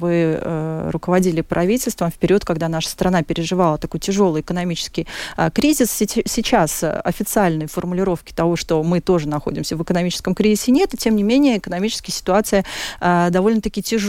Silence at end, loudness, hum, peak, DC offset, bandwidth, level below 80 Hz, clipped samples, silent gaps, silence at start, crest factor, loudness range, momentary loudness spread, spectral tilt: 0 s; -19 LUFS; none; -4 dBFS; under 0.1%; 17 kHz; -40 dBFS; under 0.1%; none; 0 s; 14 dB; 2 LU; 7 LU; -5 dB/octave